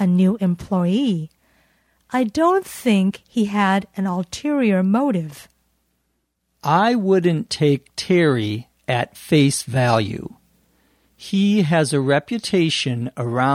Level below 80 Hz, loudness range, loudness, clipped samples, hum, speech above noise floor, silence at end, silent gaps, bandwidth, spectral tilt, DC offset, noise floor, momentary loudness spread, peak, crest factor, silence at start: -56 dBFS; 2 LU; -19 LUFS; under 0.1%; none; 53 dB; 0 s; none; 16 kHz; -6 dB/octave; under 0.1%; -71 dBFS; 9 LU; -2 dBFS; 18 dB; 0 s